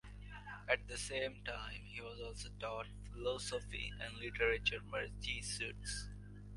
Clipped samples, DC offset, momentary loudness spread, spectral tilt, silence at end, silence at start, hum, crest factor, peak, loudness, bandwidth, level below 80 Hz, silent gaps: under 0.1%; under 0.1%; 12 LU; -3 dB/octave; 0 s; 0.05 s; 50 Hz at -55 dBFS; 24 dB; -18 dBFS; -42 LUFS; 11.5 kHz; -54 dBFS; none